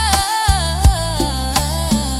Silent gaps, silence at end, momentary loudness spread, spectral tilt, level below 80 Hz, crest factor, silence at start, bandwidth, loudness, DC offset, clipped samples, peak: none; 0 s; 4 LU; -4 dB/octave; -20 dBFS; 16 dB; 0 s; 16.5 kHz; -16 LUFS; under 0.1%; under 0.1%; 0 dBFS